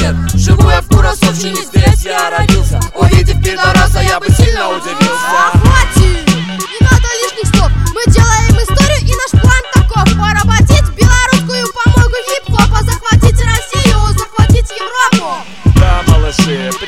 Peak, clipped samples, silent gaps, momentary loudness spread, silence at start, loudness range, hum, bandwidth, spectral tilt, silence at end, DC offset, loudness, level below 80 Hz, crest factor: 0 dBFS; 1%; none; 5 LU; 0 s; 2 LU; none; 16 kHz; -5 dB/octave; 0 s; 2%; -10 LUFS; -14 dBFS; 8 dB